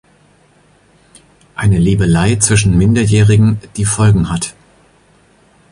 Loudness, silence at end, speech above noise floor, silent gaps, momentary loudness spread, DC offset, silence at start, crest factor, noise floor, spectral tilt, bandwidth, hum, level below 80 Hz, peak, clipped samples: -12 LUFS; 1.2 s; 39 dB; none; 8 LU; under 0.1%; 1.6 s; 14 dB; -50 dBFS; -5.5 dB/octave; 11.5 kHz; none; -30 dBFS; 0 dBFS; under 0.1%